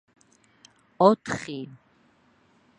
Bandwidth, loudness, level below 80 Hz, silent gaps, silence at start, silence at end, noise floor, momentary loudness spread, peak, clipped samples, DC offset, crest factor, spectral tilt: 11 kHz; -24 LUFS; -66 dBFS; none; 1 s; 1.1 s; -62 dBFS; 18 LU; -4 dBFS; under 0.1%; under 0.1%; 26 dB; -6 dB/octave